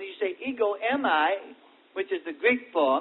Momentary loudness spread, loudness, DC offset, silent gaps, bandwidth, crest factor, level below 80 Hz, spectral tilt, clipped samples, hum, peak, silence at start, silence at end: 9 LU; -27 LUFS; under 0.1%; none; 4.2 kHz; 18 dB; -76 dBFS; -7.5 dB/octave; under 0.1%; none; -10 dBFS; 0 s; 0 s